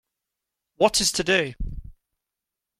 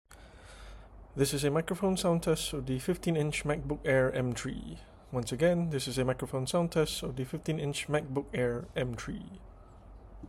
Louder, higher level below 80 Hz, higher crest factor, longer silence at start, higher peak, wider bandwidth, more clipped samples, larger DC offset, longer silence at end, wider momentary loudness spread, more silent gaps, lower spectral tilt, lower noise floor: first, -22 LUFS vs -32 LUFS; first, -40 dBFS vs -50 dBFS; about the same, 22 dB vs 18 dB; first, 0.8 s vs 0.1 s; first, -4 dBFS vs -14 dBFS; about the same, 16 kHz vs 16 kHz; neither; neither; first, 0.85 s vs 0 s; about the same, 18 LU vs 16 LU; neither; second, -2.5 dB/octave vs -5.5 dB/octave; first, -86 dBFS vs -52 dBFS